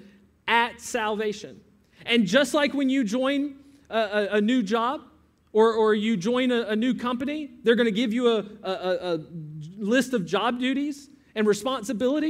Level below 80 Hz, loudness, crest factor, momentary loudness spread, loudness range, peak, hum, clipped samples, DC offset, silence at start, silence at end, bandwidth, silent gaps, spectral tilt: -66 dBFS; -25 LUFS; 20 dB; 12 LU; 3 LU; -4 dBFS; none; under 0.1%; under 0.1%; 0.45 s; 0 s; 15.5 kHz; none; -4.5 dB/octave